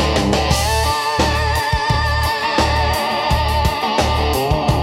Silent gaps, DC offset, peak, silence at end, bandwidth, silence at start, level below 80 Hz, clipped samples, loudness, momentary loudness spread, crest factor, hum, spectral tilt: none; under 0.1%; -2 dBFS; 0 s; 16.5 kHz; 0 s; -24 dBFS; under 0.1%; -17 LUFS; 2 LU; 16 dB; none; -4.5 dB/octave